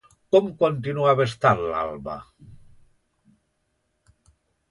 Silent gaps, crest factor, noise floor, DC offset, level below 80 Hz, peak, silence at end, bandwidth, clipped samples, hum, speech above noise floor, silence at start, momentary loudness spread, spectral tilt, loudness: none; 22 dB; -73 dBFS; under 0.1%; -56 dBFS; -4 dBFS; 2.15 s; 11 kHz; under 0.1%; none; 51 dB; 0.35 s; 14 LU; -7 dB/octave; -22 LUFS